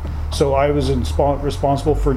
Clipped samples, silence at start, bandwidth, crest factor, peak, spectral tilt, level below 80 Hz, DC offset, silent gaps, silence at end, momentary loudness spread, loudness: under 0.1%; 0 s; 13.5 kHz; 14 dB; -4 dBFS; -6.5 dB/octave; -24 dBFS; under 0.1%; none; 0 s; 4 LU; -18 LUFS